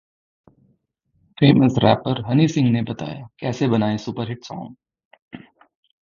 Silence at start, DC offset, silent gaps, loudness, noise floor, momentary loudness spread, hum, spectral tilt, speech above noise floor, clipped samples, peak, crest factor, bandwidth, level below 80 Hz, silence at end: 1.4 s; under 0.1%; 5.05-5.11 s, 5.22-5.28 s; -19 LUFS; -67 dBFS; 17 LU; none; -7.5 dB/octave; 48 dB; under 0.1%; 0 dBFS; 22 dB; 7.4 kHz; -54 dBFS; 0.65 s